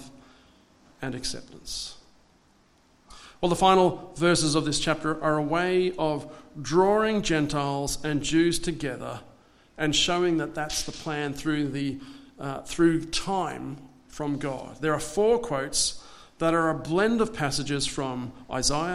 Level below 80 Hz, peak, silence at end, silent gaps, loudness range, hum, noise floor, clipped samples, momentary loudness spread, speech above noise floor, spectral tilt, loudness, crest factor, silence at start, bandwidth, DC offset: -48 dBFS; -6 dBFS; 0 s; none; 5 LU; none; -61 dBFS; under 0.1%; 14 LU; 35 dB; -4 dB/octave; -26 LUFS; 22 dB; 0 s; 13.5 kHz; under 0.1%